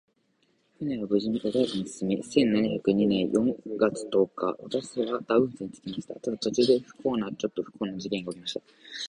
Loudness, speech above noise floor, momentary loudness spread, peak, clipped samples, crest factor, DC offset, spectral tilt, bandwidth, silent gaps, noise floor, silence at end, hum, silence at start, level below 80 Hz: -28 LUFS; 42 dB; 11 LU; -8 dBFS; under 0.1%; 20 dB; under 0.1%; -5.5 dB/octave; 11 kHz; none; -70 dBFS; 0.05 s; none; 0.8 s; -64 dBFS